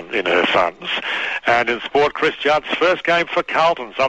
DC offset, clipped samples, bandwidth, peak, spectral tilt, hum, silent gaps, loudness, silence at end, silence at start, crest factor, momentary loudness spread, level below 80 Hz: 0.2%; under 0.1%; 8.8 kHz; -4 dBFS; -4 dB/octave; none; none; -18 LUFS; 0 s; 0 s; 14 dB; 5 LU; -52 dBFS